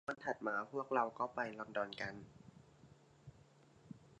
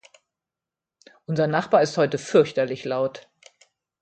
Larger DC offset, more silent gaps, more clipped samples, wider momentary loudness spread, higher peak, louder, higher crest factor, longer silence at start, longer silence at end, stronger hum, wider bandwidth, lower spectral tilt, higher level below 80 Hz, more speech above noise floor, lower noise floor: neither; neither; neither; first, 24 LU vs 10 LU; second, -20 dBFS vs -4 dBFS; second, -41 LUFS vs -22 LUFS; about the same, 24 dB vs 20 dB; second, 0.1 s vs 1.3 s; second, 0.05 s vs 0.8 s; neither; about the same, 9.6 kHz vs 9 kHz; about the same, -5.5 dB/octave vs -6 dB/octave; second, -76 dBFS vs -68 dBFS; second, 25 dB vs 67 dB; second, -66 dBFS vs -89 dBFS